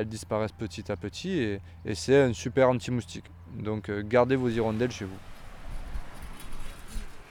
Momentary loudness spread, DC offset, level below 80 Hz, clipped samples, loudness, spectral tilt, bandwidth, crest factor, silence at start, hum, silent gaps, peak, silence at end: 21 LU; under 0.1%; -44 dBFS; under 0.1%; -28 LUFS; -6 dB/octave; 17.5 kHz; 20 dB; 0 s; none; none; -10 dBFS; 0 s